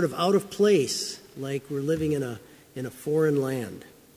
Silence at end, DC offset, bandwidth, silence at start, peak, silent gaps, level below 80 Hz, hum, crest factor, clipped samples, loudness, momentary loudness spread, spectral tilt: 0.3 s; under 0.1%; 16 kHz; 0 s; -10 dBFS; none; -58 dBFS; none; 16 dB; under 0.1%; -26 LUFS; 16 LU; -5 dB/octave